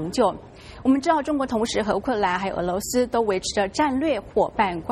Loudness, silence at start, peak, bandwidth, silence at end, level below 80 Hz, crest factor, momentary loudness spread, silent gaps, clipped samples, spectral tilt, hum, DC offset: -23 LUFS; 0 s; -8 dBFS; 13 kHz; 0 s; -48 dBFS; 16 dB; 4 LU; none; under 0.1%; -4.5 dB/octave; none; under 0.1%